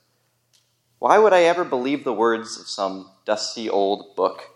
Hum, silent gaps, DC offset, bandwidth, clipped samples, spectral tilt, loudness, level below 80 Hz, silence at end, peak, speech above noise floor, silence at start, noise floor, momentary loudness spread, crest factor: none; none; under 0.1%; 11.5 kHz; under 0.1%; -3.5 dB/octave; -21 LUFS; -76 dBFS; 0.1 s; -2 dBFS; 47 dB; 1 s; -67 dBFS; 12 LU; 20 dB